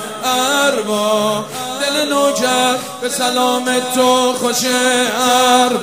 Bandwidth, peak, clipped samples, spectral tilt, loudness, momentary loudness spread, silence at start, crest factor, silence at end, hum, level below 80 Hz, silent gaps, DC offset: 16 kHz; 0 dBFS; under 0.1%; -2 dB/octave; -14 LUFS; 6 LU; 0 s; 14 dB; 0 s; none; -62 dBFS; none; 0.3%